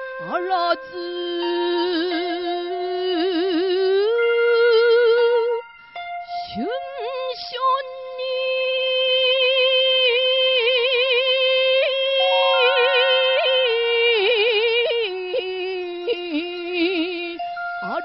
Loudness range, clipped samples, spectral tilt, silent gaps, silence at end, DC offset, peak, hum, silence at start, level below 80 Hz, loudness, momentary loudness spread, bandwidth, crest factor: 7 LU; under 0.1%; 1.5 dB/octave; none; 0 s; under 0.1%; -6 dBFS; none; 0 s; -66 dBFS; -19 LUFS; 12 LU; 5.8 kHz; 14 dB